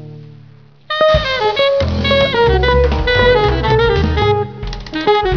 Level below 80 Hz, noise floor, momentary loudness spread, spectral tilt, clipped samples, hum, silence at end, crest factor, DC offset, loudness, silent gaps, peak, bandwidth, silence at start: -22 dBFS; -42 dBFS; 7 LU; -6.5 dB/octave; under 0.1%; none; 0 s; 14 dB; 0.4%; -14 LUFS; none; 0 dBFS; 5.4 kHz; 0 s